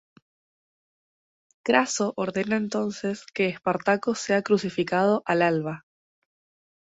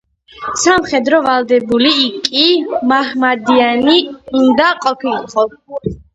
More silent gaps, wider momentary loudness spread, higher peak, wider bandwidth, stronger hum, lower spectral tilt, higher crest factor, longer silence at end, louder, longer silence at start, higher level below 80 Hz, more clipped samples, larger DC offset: neither; about the same, 8 LU vs 8 LU; second, -4 dBFS vs 0 dBFS; about the same, 8 kHz vs 8 kHz; neither; first, -4.5 dB/octave vs -3 dB/octave; first, 22 dB vs 14 dB; first, 1.15 s vs 0.2 s; second, -25 LUFS vs -13 LUFS; first, 1.65 s vs 0.35 s; second, -68 dBFS vs -46 dBFS; neither; neither